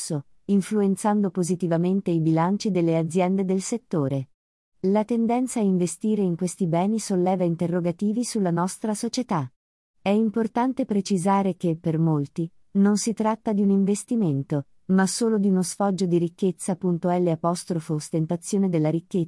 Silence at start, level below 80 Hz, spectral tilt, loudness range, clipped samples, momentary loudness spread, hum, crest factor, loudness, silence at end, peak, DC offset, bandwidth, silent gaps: 0 s; -68 dBFS; -6.5 dB/octave; 2 LU; under 0.1%; 6 LU; none; 14 dB; -24 LUFS; 0 s; -10 dBFS; under 0.1%; 12 kHz; 4.34-4.72 s, 9.56-9.94 s